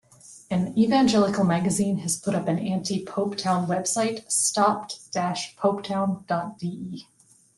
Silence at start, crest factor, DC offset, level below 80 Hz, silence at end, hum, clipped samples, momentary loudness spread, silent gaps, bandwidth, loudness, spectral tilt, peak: 0.25 s; 18 dB; under 0.1%; -62 dBFS; 0.55 s; none; under 0.1%; 11 LU; none; 12.5 kHz; -24 LUFS; -4.5 dB/octave; -8 dBFS